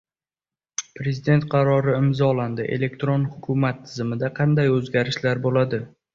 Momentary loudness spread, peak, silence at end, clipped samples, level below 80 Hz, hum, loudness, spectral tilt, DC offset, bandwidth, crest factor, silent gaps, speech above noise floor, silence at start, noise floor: 9 LU; -4 dBFS; 0.25 s; under 0.1%; -56 dBFS; none; -22 LUFS; -6.5 dB/octave; under 0.1%; 7.4 kHz; 18 dB; none; over 69 dB; 0.8 s; under -90 dBFS